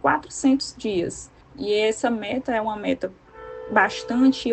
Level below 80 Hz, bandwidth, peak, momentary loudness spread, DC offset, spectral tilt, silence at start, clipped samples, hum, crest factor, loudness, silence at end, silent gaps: -54 dBFS; 9 kHz; -4 dBFS; 18 LU; under 0.1%; -4 dB/octave; 0.05 s; under 0.1%; none; 20 dB; -23 LUFS; 0 s; none